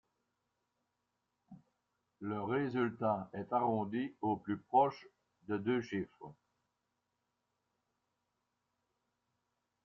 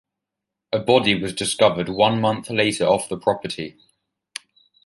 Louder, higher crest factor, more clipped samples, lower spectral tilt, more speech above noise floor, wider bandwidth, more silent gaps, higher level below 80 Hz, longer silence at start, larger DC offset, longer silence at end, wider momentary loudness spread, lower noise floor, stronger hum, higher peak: second, -36 LUFS vs -20 LUFS; about the same, 22 dB vs 20 dB; neither; first, -6 dB/octave vs -4 dB/octave; second, 50 dB vs 64 dB; second, 7.2 kHz vs 11.5 kHz; neither; second, -80 dBFS vs -56 dBFS; first, 1.5 s vs 0.7 s; neither; first, 3.55 s vs 1.15 s; second, 15 LU vs 18 LU; about the same, -86 dBFS vs -84 dBFS; neither; second, -18 dBFS vs -2 dBFS